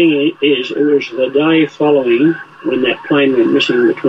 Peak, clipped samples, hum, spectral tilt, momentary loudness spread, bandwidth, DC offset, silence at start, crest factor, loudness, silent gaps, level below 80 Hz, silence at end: -2 dBFS; under 0.1%; none; -6.5 dB/octave; 4 LU; 7.8 kHz; under 0.1%; 0 s; 10 dB; -13 LUFS; none; -60 dBFS; 0 s